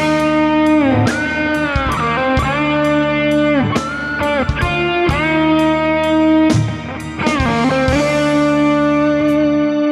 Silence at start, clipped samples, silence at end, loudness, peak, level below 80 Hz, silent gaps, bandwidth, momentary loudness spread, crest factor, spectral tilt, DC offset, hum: 0 s; under 0.1%; 0 s; -15 LUFS; -2 dBFS; -32 dBFS; none; 12 kHz; 4 LU; 12 dB; -6 dB/octave; under 0.1%; none